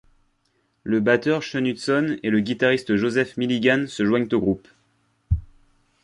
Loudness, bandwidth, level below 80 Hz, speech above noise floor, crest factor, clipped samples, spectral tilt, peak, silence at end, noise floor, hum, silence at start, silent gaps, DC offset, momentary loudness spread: -22 LUFS; 11.5 kHz; -40 dBFS; 47 dB; 18 dB; under 0.1%; -6 dB/octave; -4 dBFS; 0.6 s; -68 dBFS; none; 0.85 s; none; under 0.1%; 8 LU